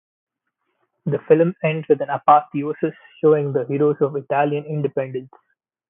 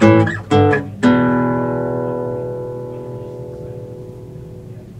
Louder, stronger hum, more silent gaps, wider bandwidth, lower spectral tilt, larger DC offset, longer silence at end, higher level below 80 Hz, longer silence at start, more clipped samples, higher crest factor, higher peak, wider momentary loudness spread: second, -20 LUFS vs -17 LUFS; neither; neither; second, 3.7 kHz vs 9.8 kHz; first, -12.5 dB/octave vs -8 dB/octave; neither; first, 0.65 s vs 0 s; second, -70 dBFS vs -46 dBFS; first, 1.05 s vs 0 s; neither; about the same, 20 dB vs 18 dB; about the same, 0 dBFS vs 0 dBFS; second, 11 LU vs 20 LU